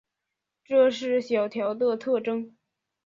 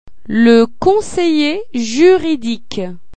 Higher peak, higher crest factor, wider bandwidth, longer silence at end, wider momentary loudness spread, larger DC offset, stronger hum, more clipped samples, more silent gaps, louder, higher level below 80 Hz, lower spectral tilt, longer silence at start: second, -10 dBFS vs 0 dBFS; about the same, 18 dB vs 14 dB; second, 7.4 kHz vs 9.2 kHz; first, 0.55 s vs 0 s; second, 9 LU vs 12 LU; second, under 0.1% vs 4%; neither; neither; neither; second, -25 LUFS vs -13 LUFS; second, -74 dBFS vs -44 dBFS; about the same, -5 dB/octave vs -5 dB/octave; first, 0.7 s vs 0.3 s